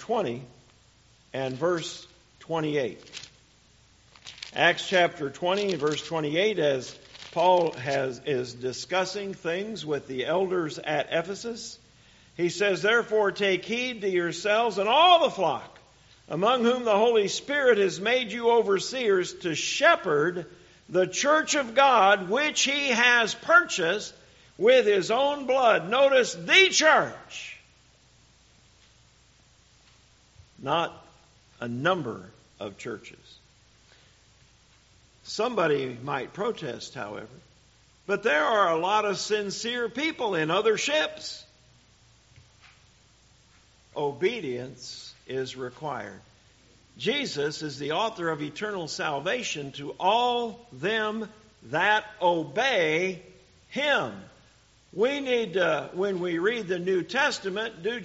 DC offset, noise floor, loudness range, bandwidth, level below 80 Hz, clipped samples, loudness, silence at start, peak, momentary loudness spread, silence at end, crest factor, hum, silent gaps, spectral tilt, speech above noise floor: under 0.1%; -60 dBFS; 12 LU; 8 kHz; -66 dBFS; under 0.1%; -25 LUFS; 0 s; -4 dBFS; 17 LU; 0 s; 22 dB; none; none; -1.5 dB/octave; 34 dB